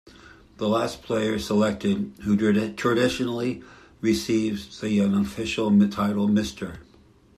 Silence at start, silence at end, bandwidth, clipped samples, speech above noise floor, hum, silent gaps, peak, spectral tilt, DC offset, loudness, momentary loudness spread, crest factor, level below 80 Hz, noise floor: 0.25 s; 0.55 s; 13.5 kHz; under 0.1%; 32 dB; none; none; -8 dBFS; -6 dB/octave; under 0.1%; -24 LUFS; 9 LU; 16 dB; -52 dBFS; -55 dBFS